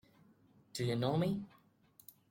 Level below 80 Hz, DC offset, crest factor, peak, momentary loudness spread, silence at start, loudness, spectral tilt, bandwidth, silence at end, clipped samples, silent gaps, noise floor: -72 dBFS; under 0.1%; 18 dB; -22 dBFS; 24 LU; 0.75 s; -37 LUFS; -6.5 dB/octave; 16.5 kHz; 0.85 s; under 0.1%; none; -67 dBFS